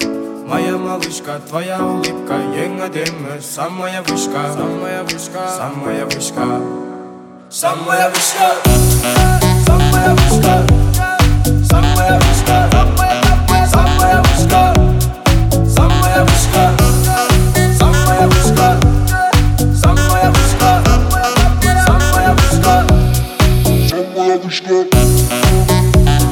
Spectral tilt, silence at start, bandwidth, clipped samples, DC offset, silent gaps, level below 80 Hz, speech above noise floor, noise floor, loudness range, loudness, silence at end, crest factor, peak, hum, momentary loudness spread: -5 dB/octave; 0 s; 19 kHz; under 0.1%; under 0.1%; none; -16 dBFS; 20 dB; -34 dBFS; 9 LU; -12 LUFS; 0 s; 12 dB; 0 dBFS; none; 10 LU